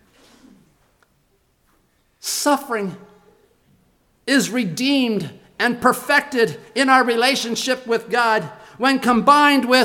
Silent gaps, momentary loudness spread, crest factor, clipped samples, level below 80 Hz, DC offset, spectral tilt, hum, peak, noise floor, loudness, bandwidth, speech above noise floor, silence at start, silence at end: none; 12 LU; 20 dB; under 0.1%; -62 dBFS; under 0.1%; -3 dB/octave; none; 0 dBFS; -63 dBFS; -18 LUFS; 19 kHz; 45 dB; 2.25 s; 0 s